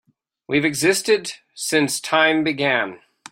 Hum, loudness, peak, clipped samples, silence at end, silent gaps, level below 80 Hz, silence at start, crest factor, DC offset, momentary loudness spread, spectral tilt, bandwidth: none; -19 LUFS; -2 dBFS; under 0.1%; 0.35 s; none; -62 dBFS; 0.5 s; 20 dB; under 0.1%; 8 LU; -3 dB/octave; 16.5 kHz